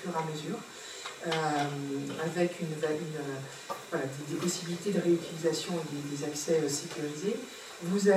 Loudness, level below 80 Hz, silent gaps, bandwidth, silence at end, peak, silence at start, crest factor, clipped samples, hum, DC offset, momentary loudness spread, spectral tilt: -33 LUFS; -76 dBFS; none; 16 kHz; 0 s; -14 dBFS; 0 s; 20 dB; under 0.1%; none; under 0.1%; 10 LU; -4.5 dB/octave